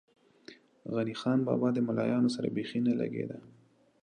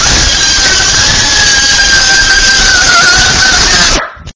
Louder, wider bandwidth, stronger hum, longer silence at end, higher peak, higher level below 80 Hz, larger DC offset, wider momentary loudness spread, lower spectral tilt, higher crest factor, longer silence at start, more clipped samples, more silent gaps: second, -31 LUFS vs -4 LUFS; first, 9.8 kHz vs 8 kHz; neither; first, 0.55 s vs 0.05 s; second, -16 dBFS vs 0 dBFS; second, -76 dBFS vs -20 dBFS; neither; first, 10 LU vs 2 LU; first, -7.5 dB/octave vs -0.5 dB/octave; first, 16 dB vs 6 dB; first, 0.5 s vs 0 s; second, under 0.1% vs 4%; neither